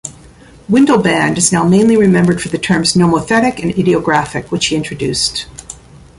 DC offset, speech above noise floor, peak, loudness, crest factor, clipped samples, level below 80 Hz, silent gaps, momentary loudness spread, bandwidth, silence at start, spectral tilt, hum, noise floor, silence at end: under 0.1%; 28 dB; 0 dBFS; -12 LUFS; 14 dB; under 0.1%; -42 dBFS; none; 12 LU; 11.5 kHz; 0.05 s; -4.5 dB/octave; none; -40 dBFS; 0.45 s